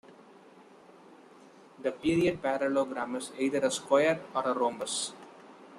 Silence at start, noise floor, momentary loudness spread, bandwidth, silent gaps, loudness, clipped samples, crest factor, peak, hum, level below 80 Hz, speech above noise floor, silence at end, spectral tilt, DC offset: 0.1 s; -55 dBFS; 11 LU; 13 kHz; none; -30 LUFS; under 0.1%; 20 dB; -12 dBFS; none; -66 dBFS; 26 dB; 0 s; -4 dB/octave; under 0.1%